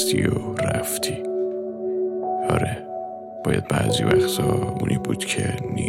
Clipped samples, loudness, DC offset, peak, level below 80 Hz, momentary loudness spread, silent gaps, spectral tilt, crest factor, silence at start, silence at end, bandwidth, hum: under 0.1%; -23 LUFS; under 0.1%; -2 dBFS; -46 dBFS; 9 LU; none; -5 dB/octave; 22 dB; 0 s; 0 s; 16.5 kHz; none